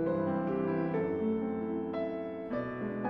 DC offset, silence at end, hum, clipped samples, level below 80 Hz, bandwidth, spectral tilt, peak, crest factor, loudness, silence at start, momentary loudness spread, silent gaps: under 0.1%; 0 s; none; under 0.1%; -62 dBFS; 5.6 kHz; -10.5 dB/octave; -22 dBFS; 12 dB; -34 LUFS; 0 s; 5 LU; none